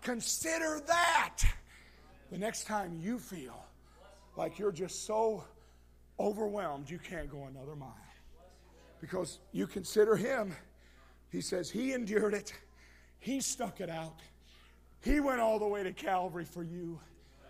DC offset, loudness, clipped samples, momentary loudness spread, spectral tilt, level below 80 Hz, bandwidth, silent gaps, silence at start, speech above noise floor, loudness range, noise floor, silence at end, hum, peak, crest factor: under 0.1%; -35 LUFS; under 0.1%; 18 LU; -4 dB/octave; -46 dBFS; 15.5 kHz; none; 0 s; 26 dB; 7 LU; -61 dBFS; 0 s; 60 Hz at -60 dBFS; -14 dBFS; 22 dB